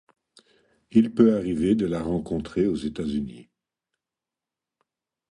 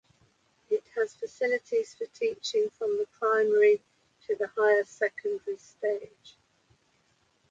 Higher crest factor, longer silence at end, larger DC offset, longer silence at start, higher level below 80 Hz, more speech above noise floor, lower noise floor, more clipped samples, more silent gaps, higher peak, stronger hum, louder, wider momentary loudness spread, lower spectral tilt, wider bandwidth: about the same, 20 dB vs 18 dB; first, 1.9 s vs 1.2 s; neither; first, 0.95 s vs 0.7 s; first, -50 dBFS vs -78 dBFS; first, 66 dB vs 41 dB; first, -89 dBFS vs -69 dBFS; neither; neither; first, -6 dBFS vs -12 dBFS; neither; first, -24 LUFS vs -29 LUFS; about the same, 10 LU vs 12 LU; first, -8 dB/octave vs -3 dB/octave; first, 10.5 kHz vs 7.8 kHz